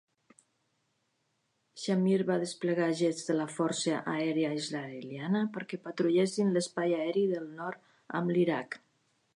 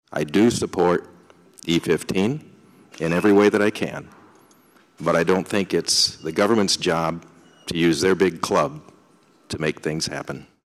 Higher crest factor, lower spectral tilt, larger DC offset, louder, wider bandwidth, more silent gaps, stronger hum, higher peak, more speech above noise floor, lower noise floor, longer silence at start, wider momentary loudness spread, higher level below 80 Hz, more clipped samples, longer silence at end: about the same, 16 dB vs 18 dB; about the same, -5.5 dB/octave vs -4.5 dB/octave; neither; second, -31 LUFS vs -21 LUFS; second, 11 kHz vs 14.5 kHz; neither; neither; second, -16 dBFS vs -4 dBFS; first, 47 dB vs 35 dB; first, -78 dBFS vs -56 dBFS; first, 1.75 s vs 0.1 s; about the same, 12 LU vs 12 LU; second, -84 dBFS vs -54 dBFS; neither; first, 0.6 s vs 0.25 s